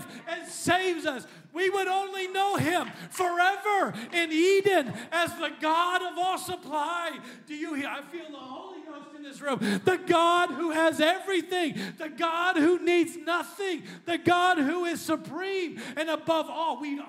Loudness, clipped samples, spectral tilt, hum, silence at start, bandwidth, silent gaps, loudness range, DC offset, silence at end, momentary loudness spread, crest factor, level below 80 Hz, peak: -27 LUFS; under 0.1%; -4 dB/octave; none; 0 s; 16 kHz; none; 5 LU; under 0.1%; 0 s; 14 LU; 20 dB; -76 dBFS; -8 dBFS